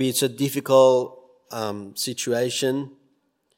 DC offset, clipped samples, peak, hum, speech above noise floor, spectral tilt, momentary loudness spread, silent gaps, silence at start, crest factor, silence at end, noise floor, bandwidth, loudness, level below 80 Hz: under 0.1%; under 0.1%; -4 dBFS; none; 47 dB; -4 dB/octave; 16 LU; none; 0 s; 20 dB; 0.7 s; -68 dBFS; 16.5 kHz; -22 LUFS; -76 dBFS